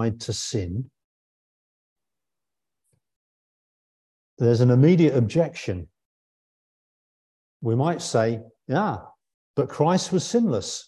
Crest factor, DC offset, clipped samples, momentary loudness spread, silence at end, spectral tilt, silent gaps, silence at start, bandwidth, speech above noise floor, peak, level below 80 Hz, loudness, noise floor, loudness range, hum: 18 dB; under 0.1%; under 0.1%; 15 LU; 0.05 s; -6.5 dB/octave; 1.04-1.96 s, 3.16-4.37 s, 6.05-7.60 s, 9.34-9.54 s; 0 s; 11.5 kHz; 67 dB; -6 dBFS; -52 dBFS; -23 LUFS; -89 dBFS; 11 LU; none